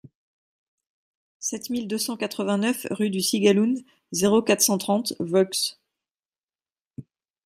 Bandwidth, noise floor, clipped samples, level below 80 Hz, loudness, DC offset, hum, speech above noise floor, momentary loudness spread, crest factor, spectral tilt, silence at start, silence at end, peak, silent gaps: 16 kHz; under -90 dBFS; under 0.1%; -70 dBFS; -23 LUFS; under 0.1%; none; over 67 dB; 10 LU; 22 dB; -3.5 dB/octave; 1.4 s; 0.45 s; -4 dBFS; 6.11-6.15 s, 6.43-6.47 s, 6.81-6.85 s